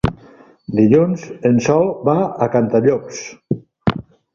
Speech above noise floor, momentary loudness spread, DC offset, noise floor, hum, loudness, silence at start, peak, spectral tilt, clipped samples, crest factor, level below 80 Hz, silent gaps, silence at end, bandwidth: 30 dB; 14 LU; under 0.1%; -45 dBFS; none; -17 LUFS; 0.05 s; -2 dBFS; -7 dB/octave; under 0.1%; 16 dB; -42 dBFS; none; 0.35 s; 7.4 kHz